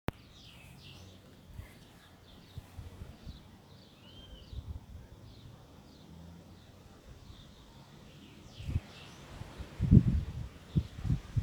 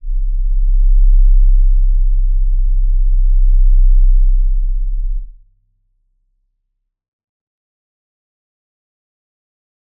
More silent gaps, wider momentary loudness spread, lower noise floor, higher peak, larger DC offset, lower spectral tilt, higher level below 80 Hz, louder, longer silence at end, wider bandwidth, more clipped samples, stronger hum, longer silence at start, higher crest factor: neither; first, 20 LU vs 9 LU; second, -57 dBFS vs -71 dBFS; second, -6 dBFS vs -2 dBFS; neither; second, -8 dB/octave vs -15.5 dB/octave; second, -44 dBFS vs -12 dBFS; second, -33 LUFS vs -17 LUFS; second, 0 s vs 4.7 s; first, 19 kHz vs 0.2 kHz; neither; neither; about the same, 0.1 s vs 0.05 s; first, 30 dB vs 10 dB